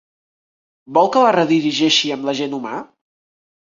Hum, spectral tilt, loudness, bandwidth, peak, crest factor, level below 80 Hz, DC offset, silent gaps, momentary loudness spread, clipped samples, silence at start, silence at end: none; -4 dB/octave; -16 LUFS; 7.6 kHz; -2 dBFS; 18 dB; -66 dBFS; under 0.1%; none; 12 LU; under 0.1%; 0.9 s; 0.9 s